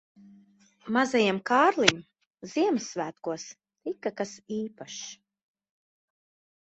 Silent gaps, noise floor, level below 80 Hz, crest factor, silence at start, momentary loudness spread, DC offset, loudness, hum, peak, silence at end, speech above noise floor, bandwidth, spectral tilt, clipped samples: 2.27-2.31 s; -60 dBFS; -70 dBFS; 28 dB; 0.85 s; 18 LU; under 0.1%; -27 LUFS; none; -2 dBFS; 1.55 s; 32 dB; 8.4 kHz; -3.5 dB/octave; under 0.1%